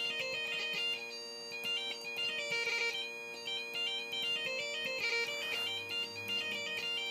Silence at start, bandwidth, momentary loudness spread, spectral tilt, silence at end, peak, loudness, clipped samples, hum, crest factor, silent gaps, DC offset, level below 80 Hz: 0 s; 15.5 kHz; 6 LU; -0.5 dB/octave; 0 s; -22 dBFS; -35 LUFS; under 0.1%; none; 16 dB; none; under 0.1%; -88 dBFS